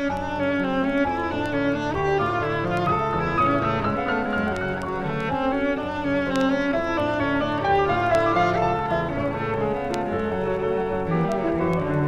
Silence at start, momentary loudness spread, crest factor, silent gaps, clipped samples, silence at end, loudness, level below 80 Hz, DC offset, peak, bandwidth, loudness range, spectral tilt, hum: 0 s; 5 LU; 16 dB; none; under 0.1%; 0 s; -23 LUFS; -42 dBFS; under 0.1%; -8 dBFS; 12 kHz; 2 LU; -7 dB/octave; none